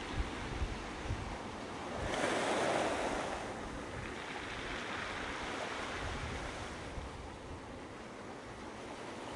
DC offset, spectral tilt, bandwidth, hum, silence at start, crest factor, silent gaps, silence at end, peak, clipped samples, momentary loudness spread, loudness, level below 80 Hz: under 0.1%; -4 dB/octave; 11.5 kHz; none; 0 s; 22 dB; none; 0 s; -20 dBFS; under 0.1%; 13 LU; -40 LUFS; -50 dBFS